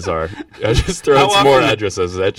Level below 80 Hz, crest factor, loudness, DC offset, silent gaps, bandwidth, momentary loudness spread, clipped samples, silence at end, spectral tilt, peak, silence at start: -28 dBFS; 14 dB; -14 LUFS; under 0.1%; none; 16 kHz; 12 LU; under 0.1%; 0.05 s; -4.5 dB/octave; 0 dBFS; 0 s